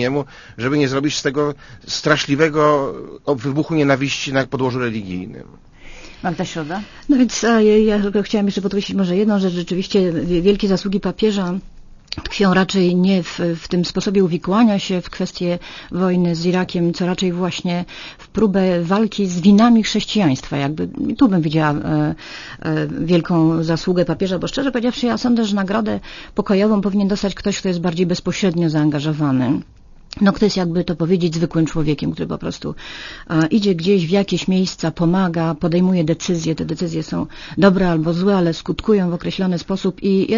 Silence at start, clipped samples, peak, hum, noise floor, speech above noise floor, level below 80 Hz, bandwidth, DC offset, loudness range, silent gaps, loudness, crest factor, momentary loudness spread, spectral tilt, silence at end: 0 s; under 0.1%; 0 dBFS; none; -37 dBFS; 20 dB; -42 dBFS; 7.4 kHz; under 0.1%; 3 LU; none; -18 LUFS; 18 dB; 10 LU; -6 dB/octave; 0 s